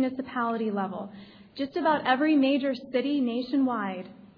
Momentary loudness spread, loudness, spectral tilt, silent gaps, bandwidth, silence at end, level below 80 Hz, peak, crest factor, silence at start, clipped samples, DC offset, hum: 13 LU; -27 LUFS; -8 dB/octave; none; 5.4 kHz; 0.1 s; -72 dBFS; -10 dBFS; 18 dB; 0 s; under 0.1%; under 0.1%; none